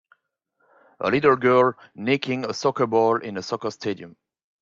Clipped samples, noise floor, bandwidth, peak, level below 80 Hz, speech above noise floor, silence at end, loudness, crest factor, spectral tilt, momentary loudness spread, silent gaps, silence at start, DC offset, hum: under 0.1%; -72 dBFS; 7.6 kHz; -4 dBFS; -66 dBFS; 50 dB; 0.5 s; -22 LUFS; 18 dB; -5.5 dB/octave; 12 LU; none; 1 s; under 0.1%; none